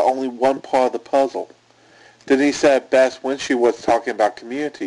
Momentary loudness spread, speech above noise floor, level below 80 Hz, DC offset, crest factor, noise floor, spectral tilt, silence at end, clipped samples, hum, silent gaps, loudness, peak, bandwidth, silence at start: 10 LU; 32 dB; -58 dBFS; under 0.1%; 14 dB; -51 dBFS; -4 dB/octave; 0 s; under 0.1%; none; none; -19 LUFS; -6 dBFS; 11 kHz; 0 s